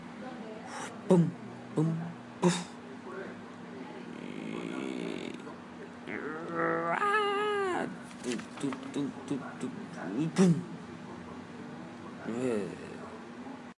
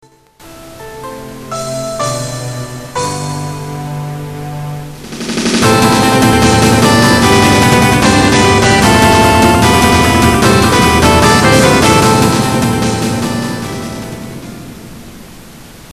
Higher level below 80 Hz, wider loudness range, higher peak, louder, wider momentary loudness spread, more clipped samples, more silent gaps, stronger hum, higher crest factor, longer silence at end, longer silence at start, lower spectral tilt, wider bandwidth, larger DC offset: second, -76 dBFS vs -28 dBFS; second, 7 LU vs 12 LU; second, -12 dBFS vs 0 dBFS; second, -34 LUFS vs -9 LUFS; about the same, 17 LU vs 19 LU; second, under 0.1% vs 0.2%; neither; neither; first, 22 dB vs 10 dB; about the same, 0.05 s vs 0.1 s; second, 0 s vs 0.45 s; first, -6 dB/octave vs -4.5 dB/octave; second, 11.5 kHz vs 14.5 kHz; neither